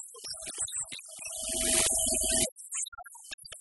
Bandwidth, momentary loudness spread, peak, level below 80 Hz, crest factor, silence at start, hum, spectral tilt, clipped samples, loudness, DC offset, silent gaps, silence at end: 12 kHz; 18 LU; -10 dBFS; -52 dBFS; 22 dB; 0 s; none; -0.5 dB/octave; under 0.1%; -29 LUFS; under 0.1%; 2.52-2.56 s, 2.88-2.92 s, 3.34-3.38 s; 0 s